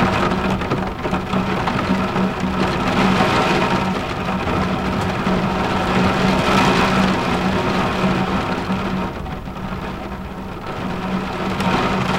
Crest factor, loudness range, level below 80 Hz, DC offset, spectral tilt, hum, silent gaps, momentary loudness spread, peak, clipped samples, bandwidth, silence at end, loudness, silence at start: 16 dB; 6 LU; -34 dBFS; under 0.1%; -6 dB/octave; none; none; 11 LU; -2 dBFS; under 0.1%; 16 kHz; 0 s; -19 LUFS; 0 s